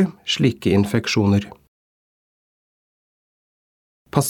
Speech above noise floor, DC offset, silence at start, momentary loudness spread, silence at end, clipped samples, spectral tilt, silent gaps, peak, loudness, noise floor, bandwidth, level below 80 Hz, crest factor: over 71 dB; under 0.1%; 0 s; 5 LU; 0 s; under 0.1%; -5.5 dB/octave; 1.68-4.05 s; -2 dBFS; -19 LUFS; under -90 dBFS; 18 kHz; -54 dBFS; 20 dB